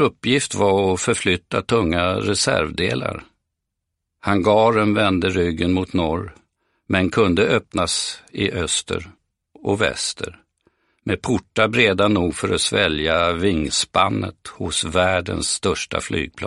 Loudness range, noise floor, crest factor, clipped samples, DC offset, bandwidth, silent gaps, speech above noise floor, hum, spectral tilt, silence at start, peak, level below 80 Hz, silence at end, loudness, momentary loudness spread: 4 LU; -79 dBFS; 20 dB; under 0.1%; under 0.1%; 11.5 kHz; none; 59 dB; none; -4 dB/octave; 0 s; 0 dBFS; -44 dBFS; 0 s; -20 LUFS; 10 LU